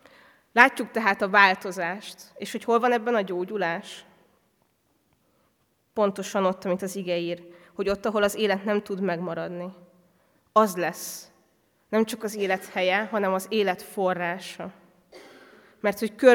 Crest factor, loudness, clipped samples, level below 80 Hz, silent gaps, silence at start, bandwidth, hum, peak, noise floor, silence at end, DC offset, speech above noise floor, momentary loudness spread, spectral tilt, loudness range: 26 dB; -25 LUFS; under 0.1%; -66 dBFS; none; 0.55 s; 19 kHz; none; 0 dBFS; -69 dBFS; 0 s; under 0.1%; 45 dB; 17 LU; -4.5 dB/octave; 7 LU